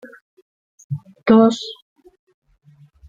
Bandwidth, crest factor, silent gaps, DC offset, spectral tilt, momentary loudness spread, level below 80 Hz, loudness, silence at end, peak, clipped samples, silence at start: 7.8 kHz; 20 dB; none; under 0.1%; -6.5 dB/octave; 20 LU; -60 dBFS; -16 LUFS; 1.35 s; -2 dBFS; under 0.1%; 0.9 s